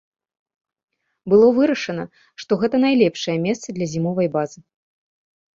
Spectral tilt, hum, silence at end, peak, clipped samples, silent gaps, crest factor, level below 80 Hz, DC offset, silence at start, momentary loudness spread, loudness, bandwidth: -6 dB/octave; none; 1.1 s; -4 dBFS; under 0.1%; none; 18 dB; -60 dBFS; under 0.1%; 1.25 s; 16 LU; -19 LUFS; 7.6 kHz